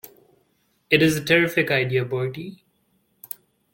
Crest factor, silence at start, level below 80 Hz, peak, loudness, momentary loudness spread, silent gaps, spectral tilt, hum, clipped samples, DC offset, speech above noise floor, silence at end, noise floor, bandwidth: 20 dB; 0.05 s; -60 dBFS; -4 dBFS; -20 LUFS; 19 LU; none; -5 dB/octave; none; under 0.1%; under 0.1%; 46 dB; 1.25 s; -67 dBFS; 17 kHz